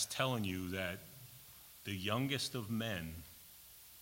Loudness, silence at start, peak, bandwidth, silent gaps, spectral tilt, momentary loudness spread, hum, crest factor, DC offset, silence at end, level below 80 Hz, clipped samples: -39 LUFS; 0 s; -18 dBFS; 16.5 kHz; none; -4 dB/octave; 18 LU; none; 22 dB; under 0.1%; 0 s; -66 dBFS; under 0.1%